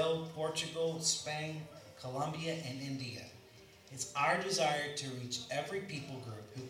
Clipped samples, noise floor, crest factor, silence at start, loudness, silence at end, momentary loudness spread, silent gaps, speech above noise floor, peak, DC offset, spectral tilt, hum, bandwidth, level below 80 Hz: under 0.1%; -59 dBFS; 20 dB; 0 s; -37 LUFS; 0 s; 15 LU; none; 21 dB; -18 dBFS; under 0.1%; -3 dB/octave; none; 16 kHz; -76 dBFS